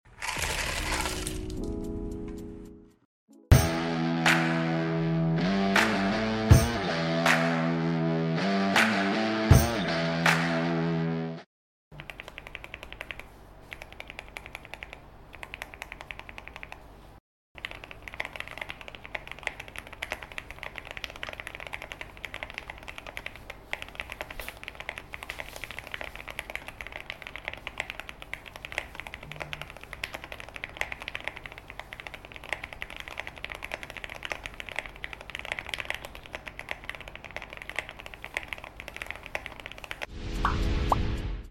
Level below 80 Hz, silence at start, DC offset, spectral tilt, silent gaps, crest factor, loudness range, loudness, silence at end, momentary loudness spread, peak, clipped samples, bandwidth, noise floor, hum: -40 dBFS; 0.05 s; under 0.1%; -5 dB/octave; 3.05-3.28 s, 11.46-11.91 s, 17.20-17.55 s; 24 dB; 17 LU; -30 LUFS; 0 s; 19 LU; -6 dBFS; under 0.1%; 16.5 kHz; -49 dBFS; none